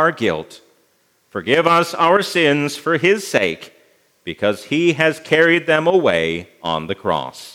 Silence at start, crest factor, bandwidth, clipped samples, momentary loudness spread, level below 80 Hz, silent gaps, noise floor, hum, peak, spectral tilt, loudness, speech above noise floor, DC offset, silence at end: 0 s; 18 dB; 16.5 kHz; under 0.1%; 11 LU; -60 dBFS; none; -61 dBFS; none; 0 dBFS; -4.5 dB/octave; -17 LUFS; 43 dB; under 0.1%; 0.05 s